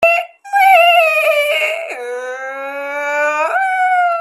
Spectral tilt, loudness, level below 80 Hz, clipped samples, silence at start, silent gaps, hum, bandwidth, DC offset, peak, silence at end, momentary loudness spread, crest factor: 0 dB/octave; -13 LUFS; -64 dBFS; under 0.1%; 0 s; none; none; 14.5 kHz; under 0.1%; 0 dBFS; 0 s; 15 LU; 14 dB